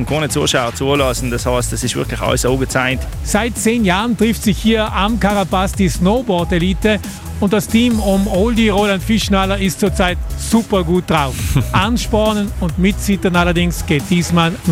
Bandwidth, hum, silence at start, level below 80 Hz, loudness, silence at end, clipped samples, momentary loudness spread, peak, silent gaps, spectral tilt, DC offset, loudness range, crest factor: 16.5 kHz; none; 0 s; -26 dBFS; -15 LUFS; 0 s; under 0.1%; 4 LU; 0 dBFS; none; -5 dB/octave; under 0.1%; 1 LU; 14 dB